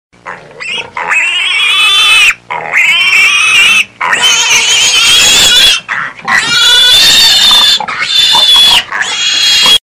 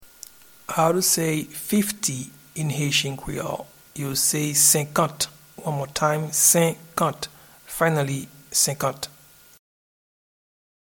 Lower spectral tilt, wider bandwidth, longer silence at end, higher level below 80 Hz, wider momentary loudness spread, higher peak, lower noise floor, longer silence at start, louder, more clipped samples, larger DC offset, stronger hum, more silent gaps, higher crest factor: second, 2 dB/octave vs -3 dB/octave; about the same, over 20 kHz vs 19 kHz; second, 0.05 s vs 1.8 s; first, -40 dBFS vs -56 dBFS; second, 10 LU vs 18 LU; about the same, 0 dBFS vs -2 dBFS; second, -27 dBFS vs -47 dBFS; first, 0.25 s vs 0 s; first, -4 LUFS vs -22 LUFS; first, 1% vs under 0.1%; neither; neither; neither; second, 8 dB vs 22 dB